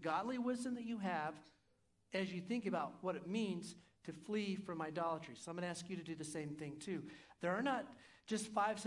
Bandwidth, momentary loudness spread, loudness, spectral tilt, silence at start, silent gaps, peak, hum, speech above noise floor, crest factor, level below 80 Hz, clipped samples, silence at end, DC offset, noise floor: 12 kHz; 10 LU; -43 LUFS; -5 dB/octave; 0 s; none; -24 dBFS; none; 35 dB; 18 dB; -82 dBFS; under 0.1%; 0 s; under 0.1%; -77 dBFS